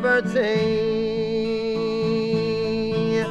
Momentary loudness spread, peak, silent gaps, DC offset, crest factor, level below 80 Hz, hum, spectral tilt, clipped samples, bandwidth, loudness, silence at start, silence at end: 4 LU; -8 dBFS; none; under 0.1%; 14 dB; -50 dBFS; none; -6.5 dB/octave; under 0.1%; 9 kHz; -23 LUFS; 0 s; 0 s